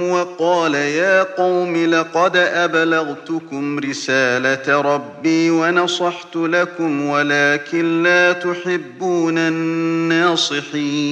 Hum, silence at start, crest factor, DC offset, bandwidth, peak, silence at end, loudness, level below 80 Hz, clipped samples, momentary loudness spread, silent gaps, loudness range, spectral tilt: none; 0 s; 16 dB; under 0.1%; 9 kHz; 0 dBFS; 0 s; -17 LUFS; -70 dBFS; under 0.1%; 7 LU; none; 1 LU; -4.5 dB/octave